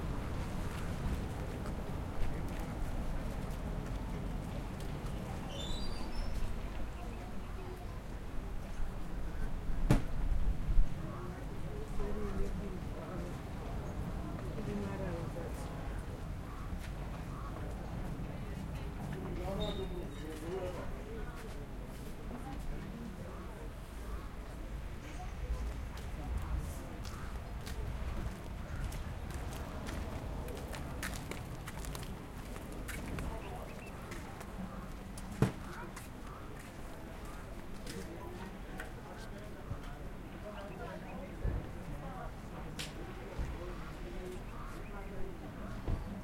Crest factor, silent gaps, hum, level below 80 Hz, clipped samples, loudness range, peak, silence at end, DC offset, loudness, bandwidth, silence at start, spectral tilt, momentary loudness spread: 24 dB; none; none; -42 dBFS; under 0.1%; 6 LU; -14 dBFS; 0 s; under 0.1%; -43 LUFS; 16.5 kHz; 0 s; -6 dB/octave; 7 LU